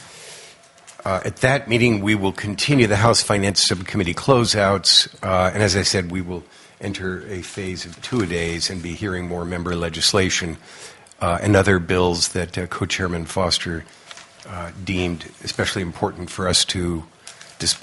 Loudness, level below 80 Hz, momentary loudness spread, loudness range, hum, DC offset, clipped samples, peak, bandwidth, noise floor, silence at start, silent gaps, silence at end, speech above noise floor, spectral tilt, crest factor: -20 LUFS; -46 dBFS; 17 LU; 8 LU; none; under 0.1%; under 0.1%; 0 dBFS; 11.5 kHz; -47 dBFS; 0 s; none; 0 s; 26 dB; -4 dB/octave; 22 dB